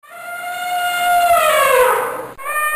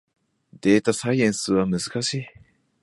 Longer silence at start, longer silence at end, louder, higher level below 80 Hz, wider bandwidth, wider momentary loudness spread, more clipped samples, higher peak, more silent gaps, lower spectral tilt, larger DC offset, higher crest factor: second, 0.1 s vs 0.65 s; second, 0 s vs 0.55 s; first, -15 LUFS vs -22 LUFS; about the same, -52 dBFS vs -56 dBFS; first, 16 kHz vs 11.5 kHz; first, 14 LU vs 8 LU; neither; about the same, -4 dBFS vs -4 dBFS; neither; second, -0.5 dB/octave vs -5 dB/octave; neither; second, 12 dB vs 20 dB